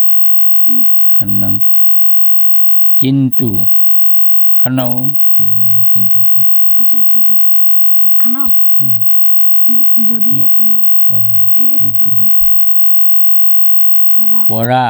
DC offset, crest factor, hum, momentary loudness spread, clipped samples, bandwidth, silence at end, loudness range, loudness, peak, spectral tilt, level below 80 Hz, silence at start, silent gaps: under 0.1%; 8 dB; none; 3 LU; under 0.1%; over 20 kHz; 0 s; 1 LU; -4 LUFS; 0 dBFS; -8 dB/octave; -44 dBFS; 0 s; none